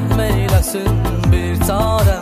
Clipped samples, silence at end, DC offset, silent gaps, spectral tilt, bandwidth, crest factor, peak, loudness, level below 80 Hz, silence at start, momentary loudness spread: under 0.1%; 0 s; under 0.1%; none; -6 dB/octave; 15.5 kHz; 12 dB; -2 dBFS; -16 LUFS; -20 dBFS; 0 s; 3 LU